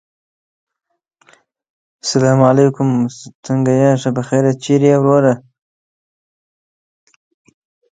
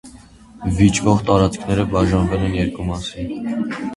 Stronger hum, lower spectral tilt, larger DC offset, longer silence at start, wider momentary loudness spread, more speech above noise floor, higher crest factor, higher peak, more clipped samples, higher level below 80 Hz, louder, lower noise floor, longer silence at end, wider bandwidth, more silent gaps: neither; about the same, -6.5 dB/octave vs -6 dB/octave; neither; first, 2.05 s vs 0.05 s; about the same, 10 LU vs 11 LU; first, 41 dB vs 25 dB; about the same, 16 dB vs 18 dB; about the same, 0 dBFS vs 0 dBFS; neither; second, -60 dBFS vs -32 dBFS; first, -14 LUFS vs -19 LUFS; first, -54 dBFS vs -43 dBFS; first, 2.55 s vs 0 s; second, 9.4 kHz vs 11.5 kHz; first, 3.35-3.43 s vs none